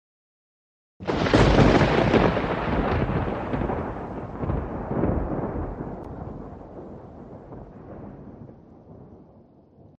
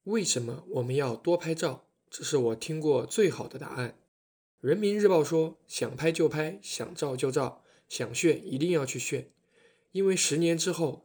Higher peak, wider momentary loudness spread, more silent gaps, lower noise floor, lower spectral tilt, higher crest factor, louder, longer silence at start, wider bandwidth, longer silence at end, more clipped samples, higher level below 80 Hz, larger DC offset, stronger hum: first, -4 dBFS vs -10 dBFS; first, 24 LU vs 12 LU; second, none vs 4.08-4.58 s; second, -53 dBFS vs -65 dBFS; first, -7 dB/octave vs -4.5 dB/octave; about the same, 22 dB vs 18 dB; first, -24 LUFS vs -29 LUFS; first, 1 s vs 0.05 s; second, 9.4 kHz vs over 20 kHz; first, 0.75 s vs 0.05 s; neither; first, -36 dBFS vs -72 dBFS; neither; neither